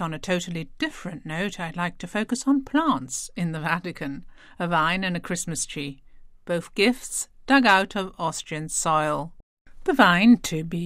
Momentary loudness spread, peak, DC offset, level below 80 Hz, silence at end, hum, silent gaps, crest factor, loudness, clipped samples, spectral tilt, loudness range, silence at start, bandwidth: 14 LU; -2 dBFS; under 0.1%; -48 dBFS; 0 s; none; 9.43-9.65 s; 22 dB; -24 LUFS; under 0.1%; -4 dB/octave; 5 LU; 0 s; 16 kHz